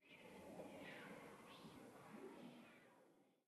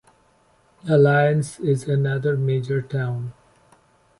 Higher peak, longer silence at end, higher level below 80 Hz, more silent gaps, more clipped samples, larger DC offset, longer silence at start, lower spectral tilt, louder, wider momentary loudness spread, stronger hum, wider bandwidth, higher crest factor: second, -44 dBFS vs -6 dBFS; second, 0.05 s vs 0.9 s; second, under -90 dBFS vs -58 dBFS; neither; neither; neither; second, 0 s vs 0.85 s; second, -5 dB/octave vs -7.5 dB/octave; second, -60 LUFS vs -21 LUFS; second, 6 LU vs 12 LU; neither; first, 13 kHz vs 11.5 kHz; about the same, 18 dB vs 16 dB